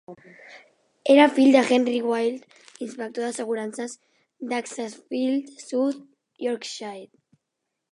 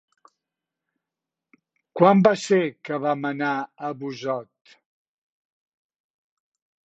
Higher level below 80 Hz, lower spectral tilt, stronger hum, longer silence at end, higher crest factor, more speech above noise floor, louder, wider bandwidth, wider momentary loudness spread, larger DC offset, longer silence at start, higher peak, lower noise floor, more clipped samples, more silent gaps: second, -82 dBFS vs -72 dBFS; second, -3.5 dB/octave vs -6.5 dB/octave; neither; second, 0.85 s vs 2.4 s; about the same, 22 dB vs 24 dB; second, 59 dB vs 66 dB; about the same, -23 LUFS vs -22 LUFS; first, 11 kHz vs 8.2 kHz; first, 21 LU vs 15 LU; neither; second, 0.1 s vs 1.95 s; about the same, -2 dBFS vs -2 dBFS; second, -81 dBFS vs -87 dBFS; neither; neither